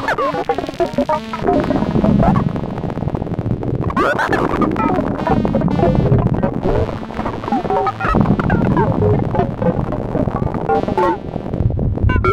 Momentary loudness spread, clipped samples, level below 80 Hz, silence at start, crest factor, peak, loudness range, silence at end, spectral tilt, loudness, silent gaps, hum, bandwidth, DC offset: 7 LU; under 0.1%; -28 dBFS; 0 s; 16 dB; 0 dBFS; 2 LU; 0 s; -8.5 dB/octave; -17 LUFS; none; none; 11 kHz; under 0.1%